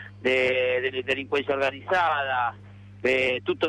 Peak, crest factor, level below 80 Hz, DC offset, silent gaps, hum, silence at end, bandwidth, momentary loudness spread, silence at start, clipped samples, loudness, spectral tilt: -14 dBFS; 12 dB; -62 dBFS; under 0.1%; none; 50 Hz at -45 dBFS; 0 s; 11 kHz; 5 LU; 0 s; under 0.1%; -25 LUFS; -5 dB/octave